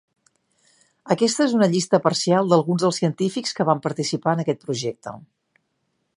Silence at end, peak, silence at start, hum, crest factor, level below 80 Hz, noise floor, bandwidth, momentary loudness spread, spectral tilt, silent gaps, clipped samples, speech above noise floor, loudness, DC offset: 0.95 s; -2 dBFS; 1.05 s; none; 20 dB; -70 dBFS; -73 dBFS; 11.5 kHz; 9 LU; -5 dB/octave; none; under 0.1%; 52 dB; -21 LUFS; under 0.1%